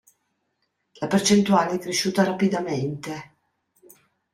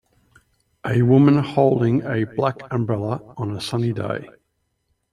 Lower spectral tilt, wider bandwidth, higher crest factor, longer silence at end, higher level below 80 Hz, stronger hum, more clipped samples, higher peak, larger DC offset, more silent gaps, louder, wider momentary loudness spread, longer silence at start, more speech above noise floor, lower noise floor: second, -4.5 dB/octave vs -8 dB/octave; first, 14.5 kHz vs 12 kHz; about the same, 18 dB vs 18 dB; first, 1.1 s vs 0.85 s; second, -64 dBFS vs -56 dBFS; neither; neither; second, -6 dBFS vs -2 dBFS; neither; neither; about the same, -22 LUFS vs -20 LUFS; about the same, 15 LU vs 13 LU; first, 1 s vs 0.85 s; about the same, 52 dB vs 52 dB; about the same, -74 dBFS vs -72 dBFS